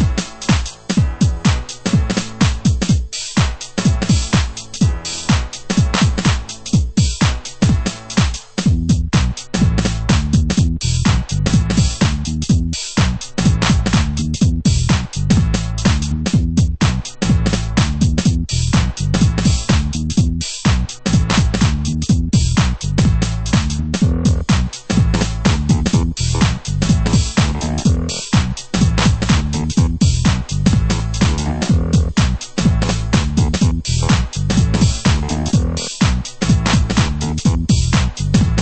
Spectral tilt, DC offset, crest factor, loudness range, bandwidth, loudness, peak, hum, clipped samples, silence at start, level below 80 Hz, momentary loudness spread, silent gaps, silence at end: -5 dB/octave; under 0.1%; 16 dB; 1 LU; 8.8 kHz; -17 LUFS; 0 dBFS; none; under 0.1%; 0 s; -22 dBFS; 4 LU; none; 0 s